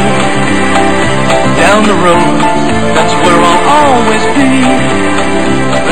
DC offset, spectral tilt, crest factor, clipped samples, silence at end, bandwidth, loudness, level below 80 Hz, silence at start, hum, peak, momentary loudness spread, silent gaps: 20%; -4.5 dB/octave; 10 dB; 1%; 0 s; 14.5 kHz; -8 LUFS; -30 dBFS; 0 s; none; 0 dBFS; 4 LU; none